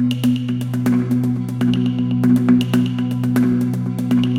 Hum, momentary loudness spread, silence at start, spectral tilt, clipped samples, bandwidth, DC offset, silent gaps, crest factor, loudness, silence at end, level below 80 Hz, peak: none; 6 LU; 0 s; -7.5 dB/octave; under 0.1%; 16 kHz; under 0.1%; none; 14 dB; -18 LUFS; 0 s; -50 dBFS; -4 dBFS